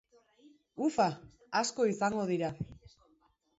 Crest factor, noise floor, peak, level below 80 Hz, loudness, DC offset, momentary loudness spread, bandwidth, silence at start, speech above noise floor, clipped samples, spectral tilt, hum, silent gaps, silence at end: 20 dB; -71 dBFS; -14 dBFS; -66 dBFS; -33 LUFS; under 0.1%; 15 LU; 8 kHz; 0.45 s; 39 dB; under 0.1%; -4.5 dB/octave; none; none; 0.7 s